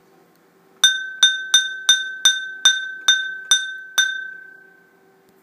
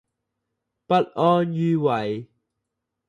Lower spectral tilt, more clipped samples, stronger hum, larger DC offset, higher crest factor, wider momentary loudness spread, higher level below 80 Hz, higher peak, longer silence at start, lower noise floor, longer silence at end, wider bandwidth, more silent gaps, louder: second, 5.5 dB/octave vs -8.5 dB/octave; neither; neither; neither; about the same, 22 dB vs 18 dB; second, 5 LU vs 8 LU; second, -90 dBFS vs -68 dBFS; first, 0 dBFS vs -6 dBFS; about the same, 0.85 s vs 0.9 s; second, -55 dBFS vs -81 dBFS; about the same, 0.95 s vs 0.85 s; first, 15.5 kHz vs 10 kHz; neither; first, -17 LUFS vs -22 LUFS